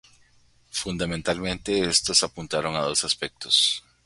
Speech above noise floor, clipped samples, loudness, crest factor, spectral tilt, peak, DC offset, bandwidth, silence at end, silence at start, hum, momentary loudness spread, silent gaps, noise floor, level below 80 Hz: 34 dB; under 0.1%; -23 LUFS; 22 dB; -2 dB/octave; -4 dBFS; under 0.1%; 11.5 kHz; 0.25 s; 0.75 s; none; 9 LU; none; -59 dBFS; -50 dBFS